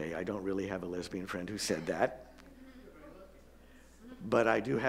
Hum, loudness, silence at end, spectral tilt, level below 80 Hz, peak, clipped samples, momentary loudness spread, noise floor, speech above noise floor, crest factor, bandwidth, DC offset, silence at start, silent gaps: none; -34 LUFS; 0 s; -5 dB/octave; -60 dBFS; -12 dBFS; under 0.1%; 24 LU; -57 dBFS; 24 dB; 24 dB; 16 kHz; under 0.1%; 0 s; none